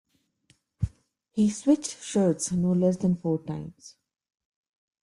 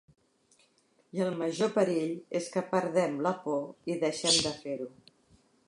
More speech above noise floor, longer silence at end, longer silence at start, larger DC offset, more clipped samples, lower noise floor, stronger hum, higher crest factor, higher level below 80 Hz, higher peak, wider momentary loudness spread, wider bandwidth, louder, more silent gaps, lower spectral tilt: about the same, 41 dB vs 38 dB; first, 1.15 s vs 0.8 s; second, 0.8 s vs 1.15 s; neither; neither; about the same, -67 dBFS vs -68 dBFS; neither; about the same, 18 dB vs 20 dB; first, -52 dBFS vs -70 dBFS; about the same, -10 dBFS vs -12 dBFS; about the same, 12 LU vs 12 LU; about the same, 11.5 kHz vs 11.5 kHz; first, -27 LUFS vs -30 LUFS; neither; first, -6.5 dB/octave vs -3.5 dB/octave